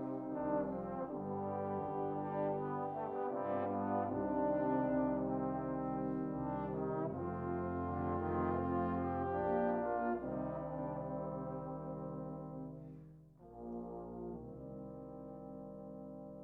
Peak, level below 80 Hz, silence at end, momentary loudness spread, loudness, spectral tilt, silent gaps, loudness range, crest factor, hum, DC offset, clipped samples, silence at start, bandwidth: -24 dBFS; -62 dBFS; 0 s; 14 LU; -40 LUFS; -11 dB/octave; none; 11 LU; 16 dB; none; under 0.1%; under 0.1%; 0 s; 4 kHz